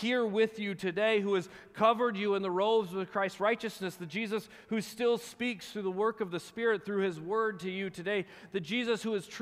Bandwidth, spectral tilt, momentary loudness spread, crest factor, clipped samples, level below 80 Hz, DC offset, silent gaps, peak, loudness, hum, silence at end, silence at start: 15.5 kHz; -5 dB/octave; 8 LU; 18 dB; under 0.1%; -76 dBFS; under 0.1%; none; -14 dBFS; -32 LUFS; none; 0 s; 0 s